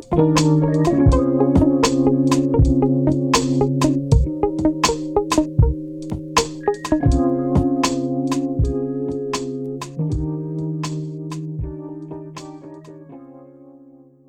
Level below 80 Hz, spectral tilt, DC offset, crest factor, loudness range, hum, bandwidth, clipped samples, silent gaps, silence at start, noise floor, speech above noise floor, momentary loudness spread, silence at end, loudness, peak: -28 dBFS; -6 dB/octave; under 0.1%; 16 dB; 12 LU; none; 15.5 kHz; under 0.1%; none; 0 s; -47 dBFS; 32 dB; 15 LU; 0.6 s; -19 LUFS; -2 dBFS